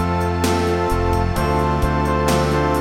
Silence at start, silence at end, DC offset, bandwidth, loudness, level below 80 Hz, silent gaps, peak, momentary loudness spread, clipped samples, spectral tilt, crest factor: 0 s; 0 s; 0.5%; 17 kHz; -19 LUFS; -26 dBFS; none; -4 dBFS; 2 LU; under 0.1%; -6 dB/octave; 14 dB